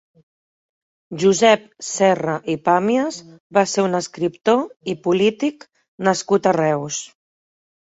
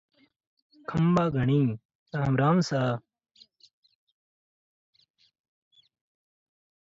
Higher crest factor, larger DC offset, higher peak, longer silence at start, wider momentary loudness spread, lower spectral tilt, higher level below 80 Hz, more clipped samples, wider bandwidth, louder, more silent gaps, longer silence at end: about the same, 18 dB vs 18 dB; neither; first, -2 dBFS vs -12 dBFS; first, 1.1 s vs 0.9 s; about the same, 11 LU vs 13 LU; second, -4.5 dB/octave vs -7.5 dB/octave; about the same, -64 dBFS vs -60 dBFS; neither; about the same, 8 kHz vs 7.8 kHz; first, -19 LUFS vs -26 LUFS; first, 3.40-3.50 s, 4.76-4.80 s, 5.88-5.98 s vs 1.85-1.89 s, 1.95-2.06 s; second, 0.85 s vs 3.95 s